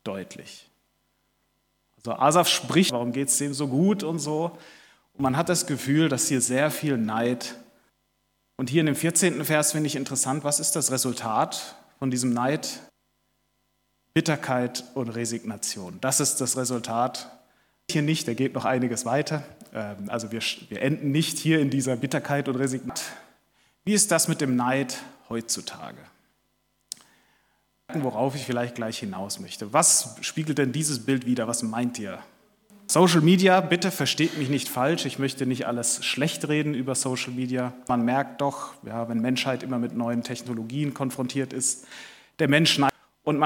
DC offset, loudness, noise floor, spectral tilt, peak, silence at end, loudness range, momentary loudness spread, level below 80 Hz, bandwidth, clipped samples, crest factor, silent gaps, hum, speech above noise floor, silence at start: under 0.1%; -25 LUFS; -72 dBFS; -4 dB/octave; -2 dBFS; 0 s; 6 LU; 14 LU; -68 dBFS; 19 kHz; under 0.1%; 24 dB; none; none; 47 dB; 0.05 s